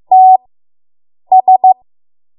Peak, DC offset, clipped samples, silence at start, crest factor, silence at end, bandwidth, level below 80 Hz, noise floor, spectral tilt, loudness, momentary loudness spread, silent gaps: 0 dBFS; under 0.1%; under 0.1%; 0.1 s; 10 dB; 0.65 s; 1.1 kHz; -70 dBFS; under -90 dBFS; -9 dB/octave; -9 LUFS; 6 LU; none